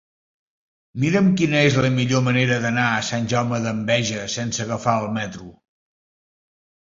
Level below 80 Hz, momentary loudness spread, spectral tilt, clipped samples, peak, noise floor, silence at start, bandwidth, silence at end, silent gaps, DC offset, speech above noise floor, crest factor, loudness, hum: -54 dBFS; 9 LU; -5 dB/octave; under 0.1%; -2 dBFS; under -90 dBFS; 0.95 s; 7.8 kHz; 1.3 s; none; under 0.1%; over 70 dB; 18 dB; -20 LUFS; none